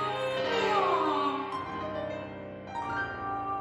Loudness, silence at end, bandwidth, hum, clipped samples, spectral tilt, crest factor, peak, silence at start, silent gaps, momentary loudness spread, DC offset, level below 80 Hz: -31 LUFS; 0 s; 13.5 kHz; none; under 0.1%; -5 dB/octave; 16 dB; -16 dBFS; 0 s; none; 12 LU; under 0.1%; -62 dBFS